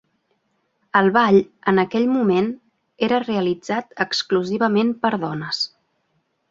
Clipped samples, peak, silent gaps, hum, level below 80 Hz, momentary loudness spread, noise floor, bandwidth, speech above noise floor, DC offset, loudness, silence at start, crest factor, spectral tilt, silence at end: under 0.1%; -2 dBFS; none; none; -64 dBFS; 9 LU; -69 dBFS; 7.8 kHz; 50 dB; under 0.1%; -20 LUFS; 0.95 s; 18 dB; -5.5 dB/octave; 0.85 s